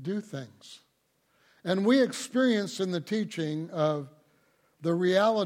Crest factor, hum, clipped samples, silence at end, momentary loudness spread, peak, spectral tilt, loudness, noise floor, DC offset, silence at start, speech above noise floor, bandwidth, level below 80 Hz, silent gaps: 18 dB; none; under 0.1%; 0 s; 17 LU; -12 dBFS; -5.5 dB/octave; -28 LUFS; -72 dBFS; under 0.1%; 0 s; 44 dB; 16 kHz; -78 dBFS; none